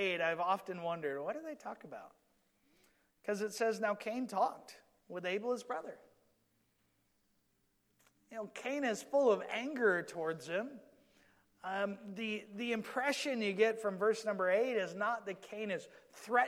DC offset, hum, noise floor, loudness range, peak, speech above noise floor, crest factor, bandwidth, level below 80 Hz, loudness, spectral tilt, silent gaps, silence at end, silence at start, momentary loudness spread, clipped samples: under 0.1%; none; -78 dBFS; 10 LU; -18 dBFS; 41 dB; 20 dB; 15.5 kHz; -86 dBFS; -37 LUFS; -4 dB/octave; none; 0 s; 0 s; 15 LU; under 0.1%